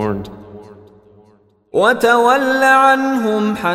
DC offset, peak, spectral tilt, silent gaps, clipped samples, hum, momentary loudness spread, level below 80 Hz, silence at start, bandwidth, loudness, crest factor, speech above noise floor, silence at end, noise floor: under 0.1%; 0 dBFS; -4.5 dB/octave; none; under 0.1%; none; 12 LU; -52 dBFS; 0 s; 16 kHz; -13 LUFS; 16 dB; 39 dB; 0 s; -52 dBFS